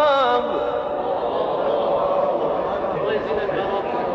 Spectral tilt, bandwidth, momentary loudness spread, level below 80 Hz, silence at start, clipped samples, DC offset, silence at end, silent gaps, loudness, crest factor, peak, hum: -6.5 dB/octave; 6.6 kHz; 4 LU; -50 dBFS; 0 s; under 0.1%; under 0.1%; 0 s; none; -22 LUFS; 14 dB; -8 dBFS; none